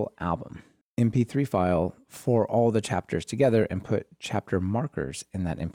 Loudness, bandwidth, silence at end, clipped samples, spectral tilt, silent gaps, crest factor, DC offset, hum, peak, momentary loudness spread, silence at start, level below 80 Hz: -27 LUFS; 16 kHz; 0 s; under 0.1%; -7 dB/octave; 0.81-0.95 s; 16 dB; under 0.1%; none; -10 dBFS; 10 LU; 0 s; -52 dBFS